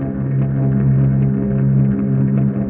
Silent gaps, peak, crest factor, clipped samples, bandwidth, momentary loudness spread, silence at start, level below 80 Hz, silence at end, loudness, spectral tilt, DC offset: none; -6 dBFS; 10 dB; under 0.1%; 2.7 kHz; 3 LU; 0 s; -36 dBFS; 0 s; -16 LUFS; -13 dB/octave; under 0.1%